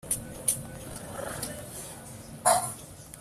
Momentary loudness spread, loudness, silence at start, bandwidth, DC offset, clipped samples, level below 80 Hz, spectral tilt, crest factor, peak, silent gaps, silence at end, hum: 18 LU; -30 LUFS; 0.05 s; 16 kHz; under 0.1%; under 0.1%; -54 dBFS; -2.5 dB/octave; 24 dB; -8 dBFS; none; 0 s; none